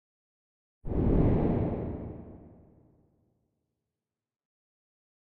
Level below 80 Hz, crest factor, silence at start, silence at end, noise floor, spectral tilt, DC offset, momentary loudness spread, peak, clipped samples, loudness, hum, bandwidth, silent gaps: -40 dBFS; 20 dB; 0.85 s; 2.7 s; under -90 dBFS; -11 dB/octave; under 0.1%; 21 LU; -12 dBFS; under 0.1%; -29 LUFS; none; 4.2 kHz; none